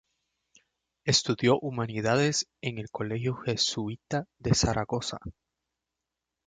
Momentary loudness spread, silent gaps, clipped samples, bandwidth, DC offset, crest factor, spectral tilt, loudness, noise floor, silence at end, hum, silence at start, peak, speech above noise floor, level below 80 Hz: 10 LU; none; under 0.1%; 9.6 kHz; under 0.1%; 22 dB; -4 dB/octave; -28 LUFS; -87 dBFS; 1.15 s; none; 1.05 s; -8 dBFS; 58 dB; -50 dBFS